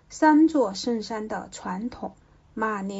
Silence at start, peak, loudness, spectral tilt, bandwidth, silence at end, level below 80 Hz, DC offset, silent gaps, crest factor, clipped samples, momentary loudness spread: 0.1 s; -6 dBFS; -25 LUFS; -5 dB/octave; 8 kHz; 0 s; -58 dBFS; under 0.1%; none; 18 dB; under 0.1%; 18 LU